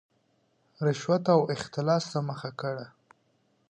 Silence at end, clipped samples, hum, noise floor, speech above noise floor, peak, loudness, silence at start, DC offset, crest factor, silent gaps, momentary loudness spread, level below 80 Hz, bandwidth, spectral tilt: 0.8 s; under 0.1%; none; -70 dBFS; 43 dB; -10 dBFS; -28 LUFS; 0.8 s; under 0.1%; 20 dB; none; 11 LU; -70 dBFS; 9.8 kHz; -6.5 dB/octave